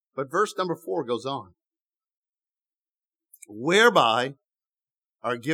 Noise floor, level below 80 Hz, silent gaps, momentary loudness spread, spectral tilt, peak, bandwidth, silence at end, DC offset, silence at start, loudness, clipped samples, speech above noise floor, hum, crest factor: under -90 dBFS; -84 dBFS; 1.81-1.85 s, 2.17-2.23 s, 2.89-2.94 s; 16 LU; -4 dB/octave; -4 dBFS; 15.5 kHz; 0 s; under 0.1%; 0.15 s; -24 LUFS; under 0.1%; over 66 dB; none; 22 dB